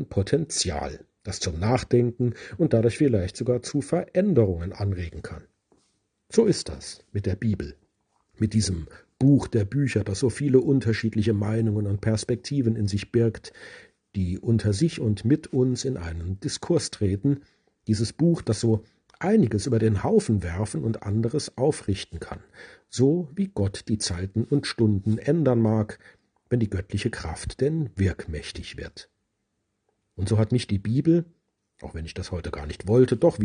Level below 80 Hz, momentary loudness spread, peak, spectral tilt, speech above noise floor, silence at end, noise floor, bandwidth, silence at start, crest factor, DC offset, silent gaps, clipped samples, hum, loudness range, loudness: -48 dBFS; 14 LU; -6 dBFS; -6.5 dB/octave; 53 dB; 0 s; -77 dBFS; 10 kHz; 0 s; 20 dB; under 0.1%; none; under 0.1%; none; 5 LU; -25 LUFS